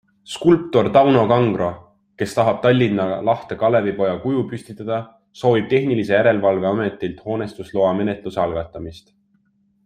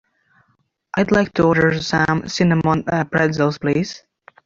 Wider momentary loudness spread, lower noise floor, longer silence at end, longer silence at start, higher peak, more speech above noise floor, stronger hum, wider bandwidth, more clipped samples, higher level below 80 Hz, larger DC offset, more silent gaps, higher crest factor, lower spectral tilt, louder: first, 12 LU vs 7 LU; about the same, -62 dBFS vs -65 dBFS; first, 0.85 s vs 0.5 s; second, 0.3 s vs 0.95 s; about the same, -2 dBFS vs -2 dBFS; second, 44 dB vs 48 dB; neither; first, 14 kHz vs 7.6 kHz; neither; second, -54 dBFS vs -46 dBFS; neither; neither; about the same, 16 dB vs 16 dB; about the same, -7 dB/octave vs -6 dB/octave; about the same, -19 LUFS vs -18 LUFS